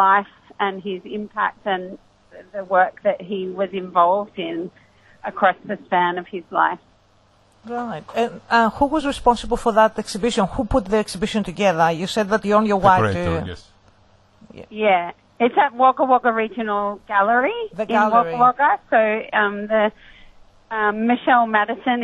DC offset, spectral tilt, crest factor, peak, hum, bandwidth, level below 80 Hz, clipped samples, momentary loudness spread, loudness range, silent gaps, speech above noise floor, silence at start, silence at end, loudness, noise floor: under 0.1%; -5.5 dB/octave; 20 dB; 0 dBFS; none; 12 kHz; -44 dBFS; under 0.1%; 13 LU; 5 LU; none; 37 dB; 0 s; 0 s; -19 LUFS; -56 dBFS